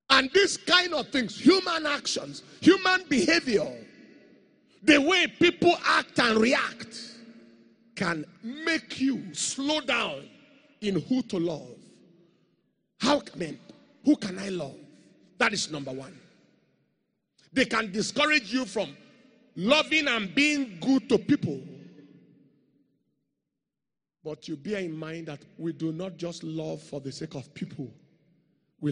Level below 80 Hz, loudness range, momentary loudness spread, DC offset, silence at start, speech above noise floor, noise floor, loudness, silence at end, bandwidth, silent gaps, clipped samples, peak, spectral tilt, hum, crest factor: -64 dBFS; 13 LU; 18 LU; under 0.1%; 0.1 s; 63 dB; -89 dBFS; -26 LUFS; 0 s; 10 kHz; none; under 0.1%; -4 dBFS; -3.5 dB/octave; none; 24 dB